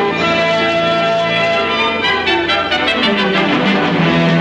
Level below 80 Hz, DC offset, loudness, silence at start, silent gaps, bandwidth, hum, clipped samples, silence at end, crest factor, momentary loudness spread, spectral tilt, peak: -46 dBFS; under 0.1%; -13 LUFS; 0 s; none; 10 kHz; none; under 0.1%; 0 s; 12 dB; 1 LU; -5.5 dB/octave; -2 dBFS